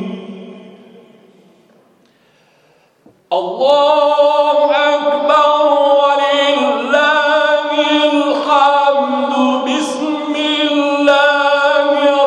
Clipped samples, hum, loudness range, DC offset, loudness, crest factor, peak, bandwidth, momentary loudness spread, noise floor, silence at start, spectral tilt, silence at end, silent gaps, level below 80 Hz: under 0.1%; none; 5 LU; under 0.1%; -12 LUFS; 14 dB; 0 dBFS; 9.8 kHz; 7 LU; -53 dBFS; 0 s; -3 dB/octave; 0 s; none; -66 dBFS